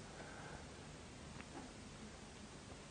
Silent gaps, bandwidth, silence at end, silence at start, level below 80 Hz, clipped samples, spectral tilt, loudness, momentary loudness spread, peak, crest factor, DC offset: none; 10 kHz; 0 s; 0 s; -64 dBFS; under 0.1%; -4 dB/octave; -54 LUFS; 2 LU; -34 dBFS; 20 dB; under 0.1%